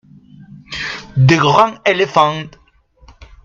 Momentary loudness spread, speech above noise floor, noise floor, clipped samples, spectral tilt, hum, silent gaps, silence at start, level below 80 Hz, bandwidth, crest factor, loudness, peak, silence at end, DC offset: 16 LU; 35 dB; -47 dBFS; under 0.1%; -6 dB/octave; none; none; 0.7 s; -46 dBFS; 7.6 kHz; 16 dB; -14 LUFS; 0 dBFS; 0.95 s; under 0.1%